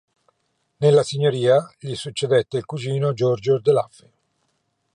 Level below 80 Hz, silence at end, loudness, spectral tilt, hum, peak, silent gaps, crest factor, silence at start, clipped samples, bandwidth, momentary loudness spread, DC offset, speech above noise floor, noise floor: -64 dBFS; 1.1 s; -20 LUFS; -6 dB/octave; none; -4 dBFS; none; 16 dB; 0.8 s; under 0.1%; 10.5 kHz; 11 LU; under 0.1%; 51 dB; -71 dBFS